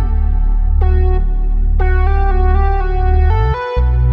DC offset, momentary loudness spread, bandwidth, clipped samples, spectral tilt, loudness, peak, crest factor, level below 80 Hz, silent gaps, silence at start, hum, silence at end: under 0.1%; 4 LU; 4.7 kHz; under 0.1%; -9.5 dB/octave; -16 LUFS; -2 dBFS; 10 dB; -12 dBFS; none; 0 s; none; 0 s